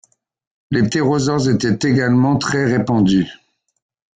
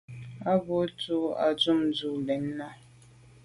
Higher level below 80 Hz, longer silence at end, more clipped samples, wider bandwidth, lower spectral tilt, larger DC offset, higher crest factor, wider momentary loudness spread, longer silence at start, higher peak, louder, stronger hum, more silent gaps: first, -48 dBFS vs -64 dBFS; first, 0.8 s vs 0.65 s; neither; second, 9.4 kHz vs 11.5 kHz; about the same, -6 dB/octave vs -6 dB/octave; neither; second, 12 dB vs 18 dB; second, 4 LU vs 12 LU; first, 0.7 s vs 0.1 s; first, -4 dBFS vs -12 dBFS; first, -16 LUFS vs -28 LUFS; neither; neither